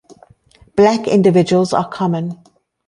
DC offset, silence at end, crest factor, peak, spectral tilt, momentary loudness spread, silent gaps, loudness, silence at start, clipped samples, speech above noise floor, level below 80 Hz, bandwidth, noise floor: under 0.1%; 0.55 s; 14 dB; -2 dBFS; -7 dB/octave; 11 LU; none; -15 LUFS; 0.75 s; under 0.1%; 36 dB; -54 dBFS; 11 kHz; -50 dBFS